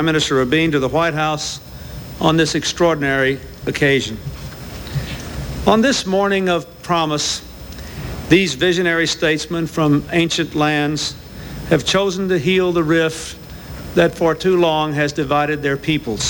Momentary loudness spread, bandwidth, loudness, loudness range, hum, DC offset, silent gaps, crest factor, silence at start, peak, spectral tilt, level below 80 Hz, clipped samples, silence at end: 15 LU; 17.5 kHz; -17 LUFS; 2 LU; none; under 0.1%; none; 18 dB; 0 s; 0 dBFS; -4.5 dB/octave; -38 dBFS; under 0.1%; 0 s